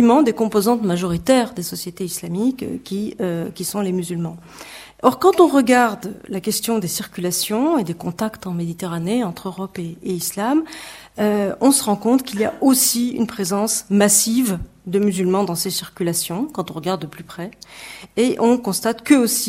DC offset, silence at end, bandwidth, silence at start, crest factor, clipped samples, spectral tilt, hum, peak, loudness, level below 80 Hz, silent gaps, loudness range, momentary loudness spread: under 0.1%; 0 s; 16.5 kHz; 0 s; 20 dB; under 0.1%; -4 dB/octave; none; 0 dBFS; -19 LUFS; -52 dBFS; none; 6 LU; 15 LU